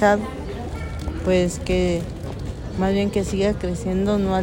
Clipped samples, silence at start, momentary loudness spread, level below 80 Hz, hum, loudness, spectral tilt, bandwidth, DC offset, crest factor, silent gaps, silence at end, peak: under 0.1%; 0 s; 11 LU; -34 dBFS; none; -23 LUFS; -6.5 dB/octave; 16.5 kHz; under 0.1%; 18 dB; none; 0 s; -4 dBFS